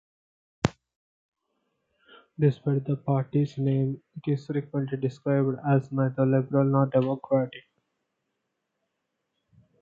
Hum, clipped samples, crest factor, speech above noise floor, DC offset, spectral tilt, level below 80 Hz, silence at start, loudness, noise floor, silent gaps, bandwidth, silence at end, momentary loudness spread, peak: none; under 0.1%; 24 dB; 55 dB; under 0.1%; -9 dB/octave; -62 dBFS; 0.65 s; -27 LUFS; -80 dBFS; 0.96-1.32 s; 7.6 kHz; 2.2 s; 7 LU; -4 dBFS